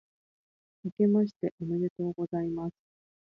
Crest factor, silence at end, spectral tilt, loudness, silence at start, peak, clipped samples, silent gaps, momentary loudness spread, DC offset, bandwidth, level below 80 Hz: 16 dB; 0.55 s; -11 dB/octave; -31 LUFS; 0.85 s; -16 dBFS; under 0.1%; 0.92-0.97 s, 1.36-1.40 s, 1.51-1.58 s, 1.90-1.96 s; 14 LU; under 0.1%; 5.6 kHz; -68 dBFS